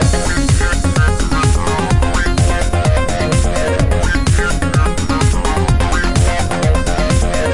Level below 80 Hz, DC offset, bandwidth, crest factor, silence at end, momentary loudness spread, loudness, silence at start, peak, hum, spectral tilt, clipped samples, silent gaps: -18 dBFS; under 0.1%; 11.5 kHz; 12 dB; 0 s; 1 LU; -15 LUFS; 0 s; -2 dBFS; none; -5 dB/octave; under 0.1%; none